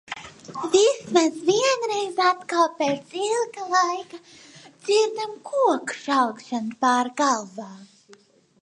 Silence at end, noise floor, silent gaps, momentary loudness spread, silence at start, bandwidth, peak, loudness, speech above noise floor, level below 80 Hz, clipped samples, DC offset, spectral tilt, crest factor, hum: 0.8 s; -55 dBFS; none; 16 LU; 0.1 s; 11.5 kHz; -4 dBFS; -23 LUFS; 32 dB; -72 dBFS; under 0.1%; under 0.1%; -2.5 dB/octave; 20 dB; none